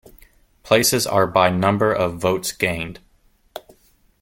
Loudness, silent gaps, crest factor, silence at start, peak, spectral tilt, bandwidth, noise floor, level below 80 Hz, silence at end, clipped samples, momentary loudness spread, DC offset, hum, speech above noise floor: -19 LUFS; none; 20 dB; 0.65 s; -2 dBFS; -4 dB/octave; 17 kHz; -58 dBFS; -50 dBFS; 0.6 s; under 0.1%; 23 LU; under 0.1%; none; 39 dB